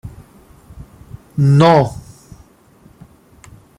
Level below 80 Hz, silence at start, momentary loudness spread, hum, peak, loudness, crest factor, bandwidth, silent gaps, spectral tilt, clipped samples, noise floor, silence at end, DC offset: -44 dBFS; 0.05 s; 27 LU; none; 0 dBFS; -13 LUFS; 18 dB; 11 kHz; none; -7.5 dB/octave; under 0.1%; -48 dBFS; 1.8 s; under 0.1%